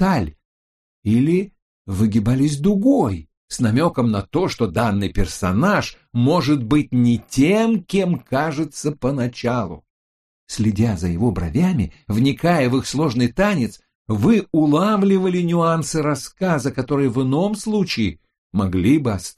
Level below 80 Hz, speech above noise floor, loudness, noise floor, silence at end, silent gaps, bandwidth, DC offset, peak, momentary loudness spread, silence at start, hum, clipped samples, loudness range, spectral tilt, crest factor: -38 dBFS; over 72 dB; -19 LUFS; under -90 dBFS; 0.05 s; 0.45-1.03 s, 1.62-1.85 s, 3.37-3.48 s, 9.90-10.47 s, 13.95-14.05 s, 18.38-18.50 s; 13.5 kHz; under 0.1%; -4 dBFS; 7 LU; 0 s; none; under 0.1%; 4 LU; -6.5 dB/octave; 16 dB